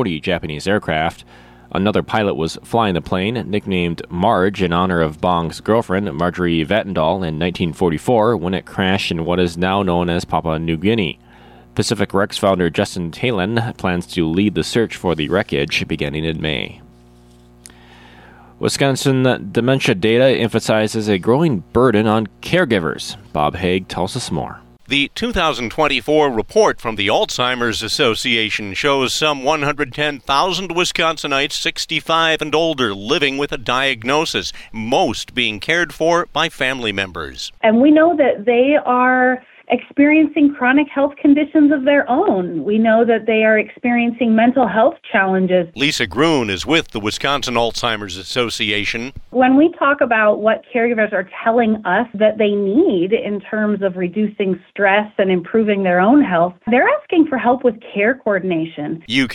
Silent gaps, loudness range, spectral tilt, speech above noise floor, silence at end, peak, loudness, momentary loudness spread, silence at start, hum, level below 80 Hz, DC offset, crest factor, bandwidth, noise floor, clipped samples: none; 5 LU; -5 dB/octave; 29 dB; 0 s; -2 dBFS; -17 LUFS; 7 LU; 0 s; none; -44 dBFS; under 0.1%; 14 dB; 16 kHz; -46 dBFS; under 0.1%